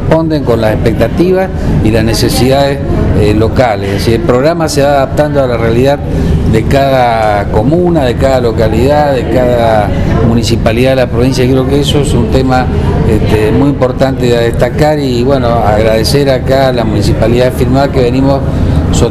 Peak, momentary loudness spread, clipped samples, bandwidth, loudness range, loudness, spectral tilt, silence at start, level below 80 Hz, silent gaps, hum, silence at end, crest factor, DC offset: 0 dBFS; 2 LU; 0.7%; 15 kHz; 1 LU; -9 LUFS; -6.5 dB/octave; 0 s; -18 dBFS; none; none; 0 s; 8 dB; 0.3%